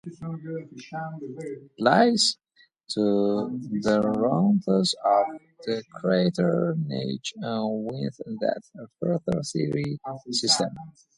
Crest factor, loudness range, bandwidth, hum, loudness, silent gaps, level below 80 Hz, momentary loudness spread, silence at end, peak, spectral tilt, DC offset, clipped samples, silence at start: 20 dB; 5 LU; 11.5 kHz; none; -25 LUFS; none; -64 dBFS; 14 LU; 0.25 s; -6 dBFS; -5 dB/octave; under 0.1%; under 0.1%; 0.05 s